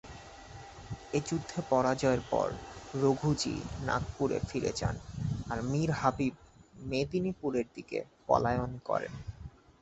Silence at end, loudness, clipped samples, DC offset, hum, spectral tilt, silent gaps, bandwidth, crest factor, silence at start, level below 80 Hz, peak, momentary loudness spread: 0.35 s; -33 LUFS; under 0.1%; under 0.1%; none; -6 dB/octave; none; 8.4 kHz; 22 dB; 0.05 s; -50 dBFS; -10 dBFS; 17 LU